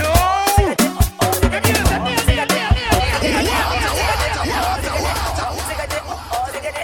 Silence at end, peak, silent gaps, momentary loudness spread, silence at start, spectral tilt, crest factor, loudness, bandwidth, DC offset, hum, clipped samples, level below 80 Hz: 0 s; 0 dBFS; none; 8 LU; 0 s; -4 dB/octave; 16 dB; -18 LUFS; 17.5 kHz; under 0.1%; none; under 0.1%; -24 dBFS